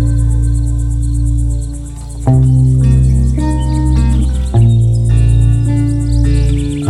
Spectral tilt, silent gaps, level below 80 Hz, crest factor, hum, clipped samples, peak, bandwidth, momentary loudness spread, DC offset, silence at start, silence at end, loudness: -8 dB/octave; none; -14 dBFS; 10 dB; none; under 0.1%; 0 dBFS; 11 kHz; 6 LU; under 0.1%; 0 s; 0 s; -12 LUFS